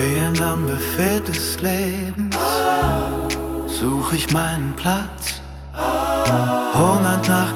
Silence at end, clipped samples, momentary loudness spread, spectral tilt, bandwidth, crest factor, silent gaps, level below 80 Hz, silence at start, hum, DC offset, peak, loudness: 0 s; under 0.1%; 8 LU; -5 dB/octave; 18.5 kHz; 16 dB; none; -36 dBFS; 0 s; none; under 0.1%; -4 dBFS; -20 LUFS